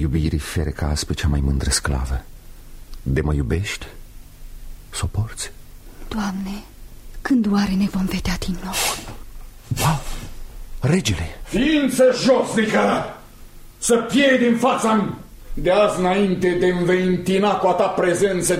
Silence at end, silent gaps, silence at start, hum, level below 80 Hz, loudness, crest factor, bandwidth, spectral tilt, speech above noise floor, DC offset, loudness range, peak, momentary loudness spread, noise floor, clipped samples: 0 s; none; 0 s; none; -32 dBFS; -20 LUFS; 16 dB; 16 kHz; -5 dB/octave; 21 dB; under 0.1%; 9 LU; -4 dBFS; 15 LU; -40 dBFS; under 0.1%